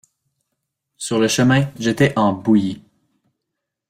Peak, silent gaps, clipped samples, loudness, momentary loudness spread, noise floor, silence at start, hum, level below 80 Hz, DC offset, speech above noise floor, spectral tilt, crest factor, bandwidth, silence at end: -4 dBFS; none; under 0.1%; -17 LUFS; 11 LU; -80 dBFS; 1 s; none; -54 dBFS; under 0.1%; 63 dB; -5.5 dB/octave; 16 dB; 15.5 kHz; 1.1 s